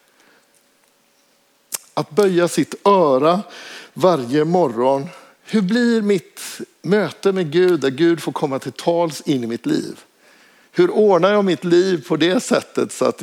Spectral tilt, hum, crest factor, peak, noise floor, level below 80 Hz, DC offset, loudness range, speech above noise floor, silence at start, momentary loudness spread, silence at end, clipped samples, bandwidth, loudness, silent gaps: -5.5 dB/octave; none; 18 dB; -2 dBFS; -59 dBFS; -76 dBFS; under 0.1%; 2 LU; 42 dB; 1.7 s; 12 LU; 0 s; under 0.1%; 16.5 kHz; -18 LUFS; none